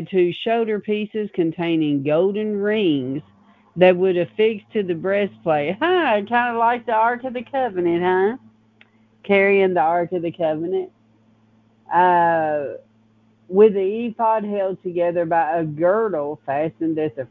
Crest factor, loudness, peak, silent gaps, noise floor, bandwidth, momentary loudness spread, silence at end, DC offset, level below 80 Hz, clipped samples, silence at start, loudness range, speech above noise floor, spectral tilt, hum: 20 dB; -20 LUFS; -2 dBFS; none; -57 dBFS; 4.5 kHz; 9 LU; 0.05 s; under 0.1%; -66 dBFS; under 0.1%; 0 s; 2 LU; 38 dB; -9 dB/octave; none